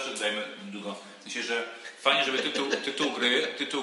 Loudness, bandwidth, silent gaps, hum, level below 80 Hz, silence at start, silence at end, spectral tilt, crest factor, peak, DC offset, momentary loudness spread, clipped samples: -28 LUFS; 11.5 kHz; none; none; under -90 dBFS; 0 s; 0 s; -2 dB/octave; 22 dB; -8 dBFS; under 0.1%; 14 LU; under 0.1%